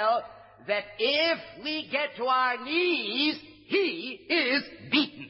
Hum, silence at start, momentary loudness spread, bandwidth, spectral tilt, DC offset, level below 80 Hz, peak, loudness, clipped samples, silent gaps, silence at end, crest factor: none; 0 s; 8 LU; 5.8 kHz; -7 dB/octave; under 0.1%; -72 dBFS; -12 dBFS; -27 LUFS; under 0.1%; none; 0 s; 18 dB